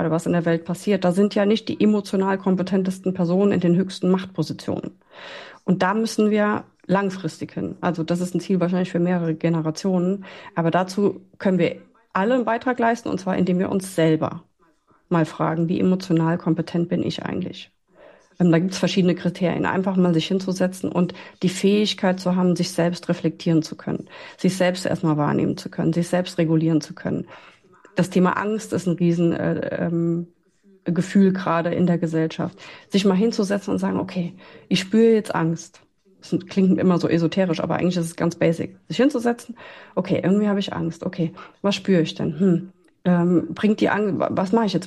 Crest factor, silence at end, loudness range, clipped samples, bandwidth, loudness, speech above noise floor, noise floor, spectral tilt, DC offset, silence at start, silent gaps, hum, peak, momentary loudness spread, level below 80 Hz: 14 dB; 0 s; 2 LU; under 0.1%; 12.5 kHz; -22 LUFS; 39 dB; -60 dBFS; -6.5 dB/octave; under 0.1%; 0 s; none; none; -8 dBFS; 9 LU; -62 dBFS